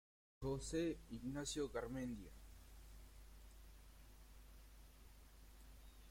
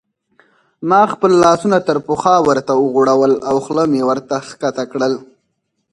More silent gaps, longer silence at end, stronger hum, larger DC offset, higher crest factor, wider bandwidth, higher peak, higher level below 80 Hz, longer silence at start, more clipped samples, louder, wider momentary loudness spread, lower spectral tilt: neither; second, 0 s vs 0.7 s; neither; neither; about the same, 18 dB vs 14 dB; first, 16.5 kHz vs 11 kHz; second, -32 dBFS vs 0 dBFS; about the same, -60 dBFS vs -56 dBFS; second, 0.4 s vs 0.8 s; neither; second, -46 LUFS vs -14 LUFS; first, 21 LU vs 9 LU; about the same, -5 dB/octave vs -5.5 dB/octave